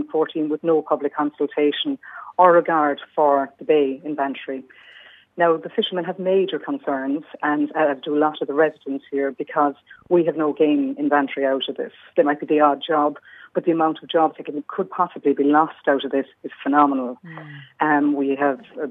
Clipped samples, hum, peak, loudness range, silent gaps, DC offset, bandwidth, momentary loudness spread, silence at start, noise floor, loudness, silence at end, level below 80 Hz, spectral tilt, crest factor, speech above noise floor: under 0.1%; none; 0 dBFS; 3 LU; none; under 0.1%; 3.9 kHz; 11 LU; 0 s; -47 dBFS; -21 LUFS; 0 s; -78 dBFS; -8 dB/octave; 20 dB; 27 dB